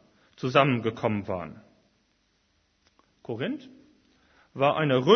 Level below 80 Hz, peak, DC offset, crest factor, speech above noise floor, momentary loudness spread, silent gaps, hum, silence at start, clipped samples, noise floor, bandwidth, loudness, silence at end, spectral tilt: -66 dBFS; -6 dBFS; under 0.1%; 22 dB; 45 dB; 18 LU; none; none; 0.4 s; under 0.1%; -70 dBFS; 6.6 kHz; -27 LUFS; 0 s; -7 dB/octave